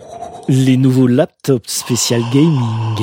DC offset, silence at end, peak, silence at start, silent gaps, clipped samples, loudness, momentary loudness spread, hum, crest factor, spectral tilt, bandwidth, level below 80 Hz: under 0.1%; 0 s; 0 dBFS; 0 s; none; under 0.1%; -14 LUFS; 6 LU; none; 14 dB; -5.5 dB/octave; 16.5 kHz; -54 dBFS